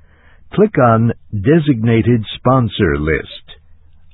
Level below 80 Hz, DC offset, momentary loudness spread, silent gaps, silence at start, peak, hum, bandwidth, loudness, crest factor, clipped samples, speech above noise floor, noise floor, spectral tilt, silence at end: -34 dBFS; under 0.1%; 8 LU; none; 0.55 s; 0 dBFS; none; 4.1 kHz; -14 LUFS; 14 dB; under 0.1%; 30 dB; -44 dBFS; -12 dB/octave; 0.6 s